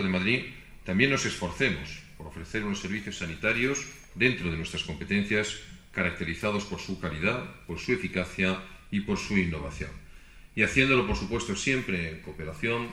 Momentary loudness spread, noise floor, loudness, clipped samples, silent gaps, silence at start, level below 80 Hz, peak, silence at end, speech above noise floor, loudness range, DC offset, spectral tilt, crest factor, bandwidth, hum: 14 LU; -49 dBFS; -29 LUFS; under 0.1%; none; 0 s; -46 dBFS; -6 dBFS; 0 s; 20 dB; 3 LU; under 0.1%; -4.5 dB/octave; 24 dB; 13 kHz; none